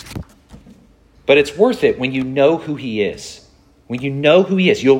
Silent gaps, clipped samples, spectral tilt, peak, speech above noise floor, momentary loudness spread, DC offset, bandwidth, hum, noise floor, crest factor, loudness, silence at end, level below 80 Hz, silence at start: none; under 0.1%; -6 dB/octave; 0 dBFS; 34 dB; 18 LU; under 0.1%; 14.5 kHz; none; -49 dBFS; 16 dB; -16 LUFS; 0 s; -48 dBFS; 0.05 s